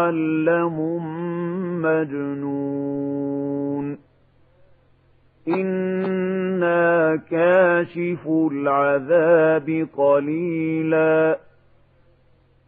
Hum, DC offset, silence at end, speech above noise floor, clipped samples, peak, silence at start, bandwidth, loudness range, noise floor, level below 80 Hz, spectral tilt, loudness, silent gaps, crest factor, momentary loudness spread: none; under 0.1%; 1.3 s; 37 dB; under 0.1%; -4 dBFS; 0 s; 4.5 kHz; 9 LU; -57 dBFS; -66 dBFS; -11 dB/octave; -21 LUFS; none; 18 dB; 10 LU